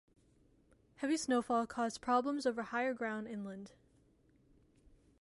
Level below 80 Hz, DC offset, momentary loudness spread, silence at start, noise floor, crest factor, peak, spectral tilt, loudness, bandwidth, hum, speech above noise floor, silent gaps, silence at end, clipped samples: -72 dBFS; under 0.1%; 12 LU; 1 s; -70 dBFS; 20 dB; -20 dBFS; -4 dB/octave; -37 LUFS; 11.5 kHz; none; 34 dB; none; 1.5 s; under 0.1%